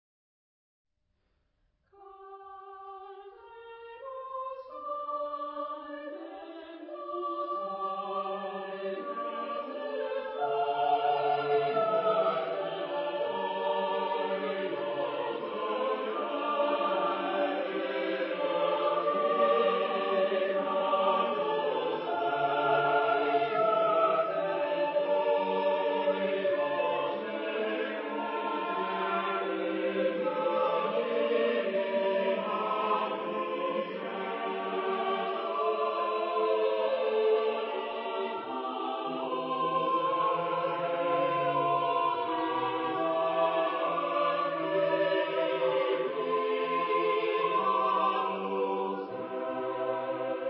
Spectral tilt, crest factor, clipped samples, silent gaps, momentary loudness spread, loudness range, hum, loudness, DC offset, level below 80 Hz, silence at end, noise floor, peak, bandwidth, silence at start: -2.5 dB/octave; 16 dB; under 0.1%; none; 9 LU; 9 LU; none; -30 LUFS; under 0.1%; -84 dBFS; 0 s; -77 dBFS; -14 dBFS; 5.6 kHz; 2 s